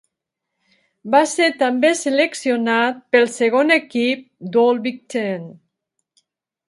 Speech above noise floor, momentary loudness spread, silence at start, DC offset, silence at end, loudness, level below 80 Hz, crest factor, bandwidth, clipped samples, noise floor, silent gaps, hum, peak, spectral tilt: 63 dB; 9 LU; 1.05 s; under 0.1%; 1.15 s; -18 LUFS; -74 dBFS; 18 dB; 11.5 kHz; under 0.1%; -80 dBFS; none; none; 0 dBFS; -3.5 dB/octave